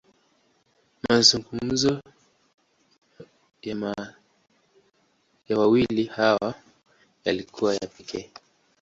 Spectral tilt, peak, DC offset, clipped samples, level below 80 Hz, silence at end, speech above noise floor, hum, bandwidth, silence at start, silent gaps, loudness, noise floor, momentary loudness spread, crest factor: -3.5 dB/octave; -4 dBFS; under 0.1%; under 0.1%; -58 dBFS; 0.55 s; 43 dB; none; 8 kHz; 1.1 s; 2.54-2.58 s; -24 LUFS; -67 dBFS; 19 LU; 24 dB